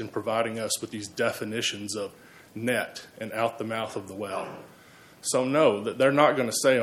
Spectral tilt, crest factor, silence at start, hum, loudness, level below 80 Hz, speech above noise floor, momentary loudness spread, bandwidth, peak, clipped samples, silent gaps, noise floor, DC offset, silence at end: -3.5 dB/octave; 20 dB; 0 s; none; -27 LUFS; -72 dBFS; 25 dB; 13 LU; 16 kHz; -6 dBFS; under 0.1%; none; -52 dBFS; under 0.1%; 0 s